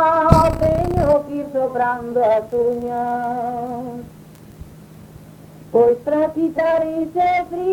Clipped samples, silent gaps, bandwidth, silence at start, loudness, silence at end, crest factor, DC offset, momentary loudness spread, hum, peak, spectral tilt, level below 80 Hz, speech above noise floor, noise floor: under 0.1%; none; 19 kHz; 0 s; -18 LUFS; 0 s; 18 dB; under 0.1%; 10 LU; none; 0 dBFS; -8 dB/octave; -34 dBFS; 22 dB; -41 dBFS